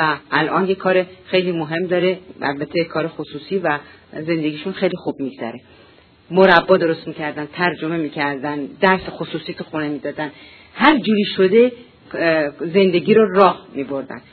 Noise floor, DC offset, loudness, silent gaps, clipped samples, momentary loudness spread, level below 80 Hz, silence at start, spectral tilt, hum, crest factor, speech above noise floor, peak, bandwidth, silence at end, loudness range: -49 dBFS; under 0.1%; -18 LUFS; none; under 0.1%; 14 LU; -56 dBFS; 0 s; -8.5 dB/octave; none; 18 dB; 31 dB; 0 dBFS; 6 kHz; 0.15 s; 6 LU